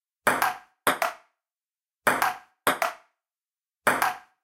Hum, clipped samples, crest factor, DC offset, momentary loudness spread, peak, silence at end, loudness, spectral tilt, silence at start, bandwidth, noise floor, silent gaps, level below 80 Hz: none; under 0.1%; 24 dB; under 0.1%; 5 LU; -4 dBFS; 0.25 s; -26 LUFS; -2 dB/octave; 0.25 s; 17 kHz; under -90 dBFS; none; -70 dBFS